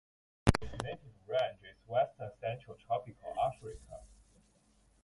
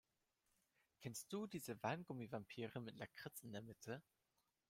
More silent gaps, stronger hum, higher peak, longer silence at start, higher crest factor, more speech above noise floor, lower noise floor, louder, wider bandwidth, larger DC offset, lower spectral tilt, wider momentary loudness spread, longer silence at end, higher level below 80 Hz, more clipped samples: neither; neither; first, -8 dBFS vs -30 dBFS; second, 0.45 s vs 1 s; first, 30 dB vs 22 dB; second, 31 dB vs 37 dB; second, -69 dBFS vs -88 dBFS; first, -37 LUFS vs -51 LUFS; second, 11.5 kHz vs 16 kHz; neither; about the same, -6 dB/octave vs -5 dB/octave; first, 17 LU vs 8 LU; first, 0.95 s vs 0.7 s; first, -50 dBFS vs -86 dBFS; neither